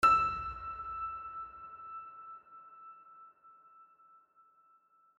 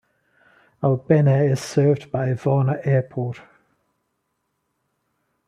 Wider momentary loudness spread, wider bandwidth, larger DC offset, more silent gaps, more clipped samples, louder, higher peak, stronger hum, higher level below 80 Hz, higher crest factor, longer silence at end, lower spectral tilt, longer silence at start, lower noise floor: first, 24 LU vs 11 LU; about the same, 11.5 kHz vs 11 kHz; neither; neither; neither; second, -36 LUFS vs -21 LUFS; second, -14 dBFS vs -2 dBFS; neither; about the same, -60 dBFS vs -62 dBFS; about the same, 22 dB vs 20 dB; second, 1.35 s vs 2.1 s; second, -3.5 dB/octave vs -8 dB/octave; second, 0 s vs 0.8 s; second, -68 dBFS vs -74 dBFS